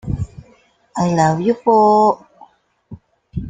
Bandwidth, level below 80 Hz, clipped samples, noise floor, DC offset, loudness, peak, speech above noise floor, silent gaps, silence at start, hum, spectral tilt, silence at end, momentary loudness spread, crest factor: 9.4 kHz; -40 dBFS; under 0.1%; -53 dBFS; under 0.1%; -15 LUFS; -2 dBFS; 39 dB; none; 0.05 s; none; -7 dB/octave; 0 s; 18 LU; 16 dB